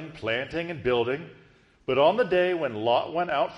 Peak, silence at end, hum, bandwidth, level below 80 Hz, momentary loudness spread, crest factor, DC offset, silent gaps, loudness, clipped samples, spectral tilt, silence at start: -10 dBFS; 0 s; none; 11 kHz; -58 dBFS; 9 LU; 16 dB; under 0.1%; none; -26 LUFS; under 0.1%; -6.5 dB/octave; 0 s